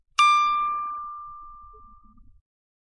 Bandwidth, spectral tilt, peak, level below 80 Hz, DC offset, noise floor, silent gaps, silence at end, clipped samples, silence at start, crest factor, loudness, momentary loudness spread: 11 kHz; 1.5 dB/octave; -6 dBFS; -56 dBFS; under 0.1%; -51 dBFS; none; 1 s; under 0.1%; 0.2 s; 20 dB; -22 LUFS; 25 LU